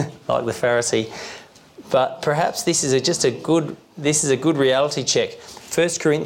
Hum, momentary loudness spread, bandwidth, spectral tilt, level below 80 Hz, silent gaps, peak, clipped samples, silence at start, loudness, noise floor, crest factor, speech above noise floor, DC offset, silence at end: none; 11 LU; 17 kHz; -3.5 dB/octave; -60 dBFS; none; -8 dBFS; under 0.1%; 0 s; -20 LUFS; -44 dBFS; 14 dB; 24 dB; under 0.1%; 0 s